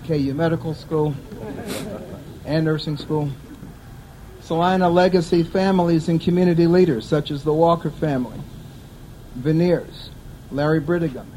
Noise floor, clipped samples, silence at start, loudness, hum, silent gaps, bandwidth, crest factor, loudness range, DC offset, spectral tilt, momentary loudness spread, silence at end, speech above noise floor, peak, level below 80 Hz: -40 dBFS; under 0.1%; 0 s; -20 LUFS; none; none; 15.5 kHz; 18 dB; 8 LU; under 0.1%; -7.5 dB/octave; 22 LU; 0 s; 21 dB; -2 dBFS; -44 dBFS